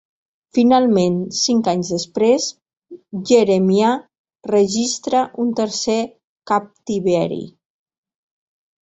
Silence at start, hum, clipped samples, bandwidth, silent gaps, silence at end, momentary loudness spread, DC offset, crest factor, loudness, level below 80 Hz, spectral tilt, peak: 0.55 s; none; under 0.1%; 8.2 kHz; 4.19-4.24 s, 6.24-6.36 s; 1.35 s; 12 LU; under 0.1%; 16 dB; -18 LUFS; -60 dBFS; -5 dB/octave; -2 dBFS